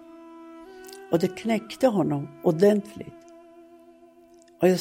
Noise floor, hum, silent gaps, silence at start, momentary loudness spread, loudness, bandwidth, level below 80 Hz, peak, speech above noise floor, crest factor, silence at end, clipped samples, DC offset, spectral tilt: -54 dBFS; none; none; 0.15 s; 24 LU; -24 LUFS; 16.5 kHz; -66 dBFS; -8 dBFS; 30 dB; 20 dB; 0 s; under 0.1%; under 0.1%; -7 dB/octave